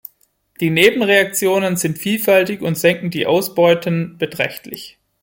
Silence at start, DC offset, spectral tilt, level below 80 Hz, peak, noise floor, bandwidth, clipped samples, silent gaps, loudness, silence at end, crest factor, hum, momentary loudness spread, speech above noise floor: 0.6 s; under 0.1%; -4.5 dB/octave; -58 dBFS; 0 dBFS; -59 dBFS; 17 kHz; under 0.1%; none; -16 LUFS; 0.35 s; 18 dB; none; 9 LU; 43 dB